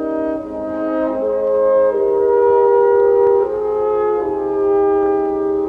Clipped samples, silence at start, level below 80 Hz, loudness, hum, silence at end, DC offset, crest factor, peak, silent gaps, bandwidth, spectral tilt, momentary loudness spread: under 0.1%; 0 s; -48 dBFS; -16 LUFS; none; 0 s; under 0.1%; 12 dB; -4 dBFS; none; 3.5 kHz; -8.5 dB/octave; 8 LU